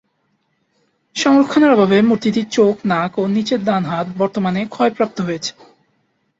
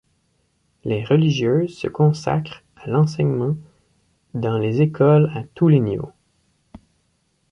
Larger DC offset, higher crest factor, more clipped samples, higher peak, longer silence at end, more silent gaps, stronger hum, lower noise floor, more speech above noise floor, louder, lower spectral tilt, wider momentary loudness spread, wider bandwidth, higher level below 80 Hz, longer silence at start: neither; about the same, 16 dB vs 18 dB; neither; about the same, -2 dBFS vs -4 dBFS; second, 0.9 s vs 1.45 s; neither; neither; about the same, -66 dBFS vs -66 dBFS; about the same, 50 dB vs 48 dB; first, -16 LUFS vs -19 LUFS; second, -5.5 dB/octave vs -8.5 dB/octave; second, 10 LU vs 14 LU; about the same, 8 kHz vs 7.4 kHz; about the same, -58 dBFS vs -54 dBFS; first, 1.15 s vs 0.85 s